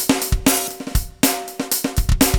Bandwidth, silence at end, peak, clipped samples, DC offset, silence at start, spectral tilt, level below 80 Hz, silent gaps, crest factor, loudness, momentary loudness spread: over 20 kHz; 0 s; -6 dBFS; under 0.1%; under 0.1%; 0 s; -3.5 dB/octave; -24 dBFS; none; 12 dB; -20 LUFS; 8 LU